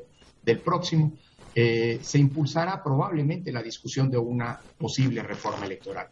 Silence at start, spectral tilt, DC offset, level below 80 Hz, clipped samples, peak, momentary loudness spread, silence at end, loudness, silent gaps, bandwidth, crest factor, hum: 0 s; -6.5 dB/octave; under 0.1%; -62 dBFS; under 0.1%; -8 dBFS; 10 LU; 0.05 s; -27 LUFS; none; 7.8 kHz; 18 dB; none